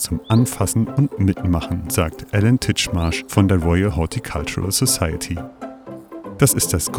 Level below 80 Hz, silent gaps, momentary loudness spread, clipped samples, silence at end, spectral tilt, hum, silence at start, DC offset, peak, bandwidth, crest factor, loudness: -34 dBFS; none; 15 LU; under 0.1%; 0 s; -5 dB/octave; none; 0 s; under 0.1%; 0 dBFS; 18 kHz; 18 dB; -19 LUFS